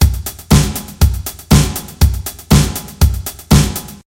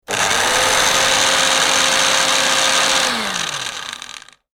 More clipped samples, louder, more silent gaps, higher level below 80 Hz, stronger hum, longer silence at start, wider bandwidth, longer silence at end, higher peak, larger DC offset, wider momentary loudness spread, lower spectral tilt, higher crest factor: neither; about the same, -15 LUFS vs -14 LUFS; neither; first, -18 dBFS vs -48 dBFS; neither; about the same, 0 s vs 0.1 s; about the same, 17.5 kHz vs 17.5 kHz; second, 0.1 s vs 0.35 s; about the same, 0 dBFS vs 0 dBFS; neither; second, 9 LU vs 12 LU; first, -5 dB/octave vs 0.5 dB/octave; about the same, 14 dB vs 16 dB